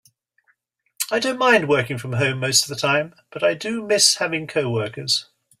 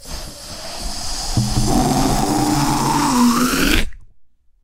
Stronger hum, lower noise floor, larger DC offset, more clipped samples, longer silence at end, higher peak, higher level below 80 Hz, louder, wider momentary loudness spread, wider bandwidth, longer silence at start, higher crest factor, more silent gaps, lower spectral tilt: neither; first, -67 dBFS vs -48 dBFS; neither; neither; about the same, 0.35 s vs 0.4 s; about the same, 0 dBFS vs -2 dBFS; second, -62 dBFS vs -26 dBFS; second, -20 LUFS vs -17 LUFS; second, 9 LU vs 16 LU; about the same, 16 kHz vs 16 kHz; first, 1 s vs 0 s; about the same, 20 dB vs 16 dB; neither; second, -2.5 dB/octave vs -4 dB/octave